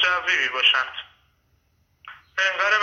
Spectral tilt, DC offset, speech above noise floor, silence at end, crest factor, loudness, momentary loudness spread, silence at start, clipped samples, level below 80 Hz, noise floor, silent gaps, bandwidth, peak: 0.5 dB/octave; under 0.1%; 43 dB; 0 s; 18 dB; -20 LUFS; 13 LU; 0 s; under 0.1%; -66 dBFS; -65 dBFS; none; 9 kHz; -6 dBFS